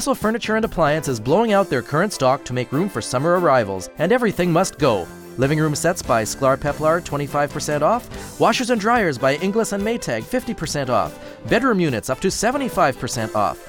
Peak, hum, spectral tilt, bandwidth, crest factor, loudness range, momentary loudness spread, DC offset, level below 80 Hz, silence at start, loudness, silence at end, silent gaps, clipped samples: -2 dBFS; none; -5 dB/octave; 18.5 kHz; 18 dB; 2 LU; 6 LU; under 0.1%; -44 dBFS; 0 s; -20 LUFS; 0 s; none; under 0.1%